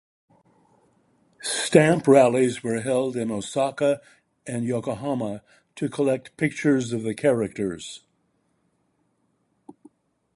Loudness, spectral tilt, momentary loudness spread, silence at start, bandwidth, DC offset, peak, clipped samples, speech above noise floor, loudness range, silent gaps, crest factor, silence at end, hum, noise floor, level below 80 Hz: -23 LUFS; -5.5 dB/octave; 16 LU; 1.4 s; 11.5 kHz; under 0.1%; -2 dBFS; under 0.1%; 47 dB; 6 LU; none; 22 dB; 2.4 s; none; -70 dBFS; -62 dBFS